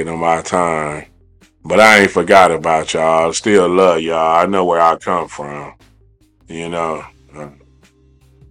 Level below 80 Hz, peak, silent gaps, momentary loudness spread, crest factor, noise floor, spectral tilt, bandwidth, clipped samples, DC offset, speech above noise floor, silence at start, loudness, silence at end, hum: -48 dBFS; 0 dBFS; none; 19 LU; 14 dB; -51 dBFS; -4 dB/octave; 17 kHz; 0.3%; under 0.1%; 38 dB; 0 s; -13 LUFS; 1 s; none